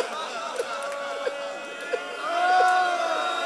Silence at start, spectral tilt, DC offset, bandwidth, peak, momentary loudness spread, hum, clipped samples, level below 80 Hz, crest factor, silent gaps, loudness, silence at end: 0 s; -0.5 dB/octave; under 0.1%; 13 kHz; -10 dBFS; 11 LU; none; under 0.1%; -82 dBFS; 16 dB; none; -26 LUFS; 0 s